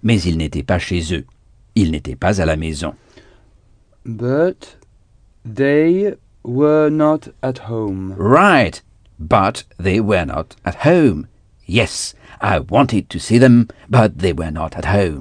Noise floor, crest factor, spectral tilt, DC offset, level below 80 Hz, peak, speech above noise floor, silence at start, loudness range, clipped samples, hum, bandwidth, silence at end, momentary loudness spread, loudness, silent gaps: -51 dBFS; 16 dB; -6.5 dB/octave; under 0.1%; -36 dBFS; 0 dBFS; 35 dB; 0 s; 6 LU; under 0.1%; none; 10 kHz; 0 s; 13 LU; -16 LUFS; none